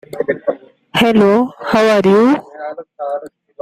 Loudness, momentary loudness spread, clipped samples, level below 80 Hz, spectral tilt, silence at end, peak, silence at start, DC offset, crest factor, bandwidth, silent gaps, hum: -14 LUFS; 17 LU; under 0.1%; -52 dBFS; -6 dB/octave; 0.35 s; -2 dBFS; 0.15 s; under 0.1%; 14 dB; 15.5 kHz; none; none